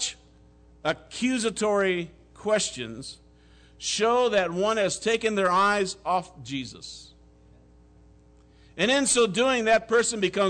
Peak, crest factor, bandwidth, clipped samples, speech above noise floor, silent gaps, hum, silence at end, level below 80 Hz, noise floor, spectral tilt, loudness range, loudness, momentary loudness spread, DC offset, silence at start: -12 dBFS; 14 dB; 9.4 kHz; under 0.1%; 30 dB; none; none; 0 s; -56 dBFS; -55 dBFS; -3 dB/octave; 4 LU; -25 LUFS; 15 LU; under 0.1%; 0 s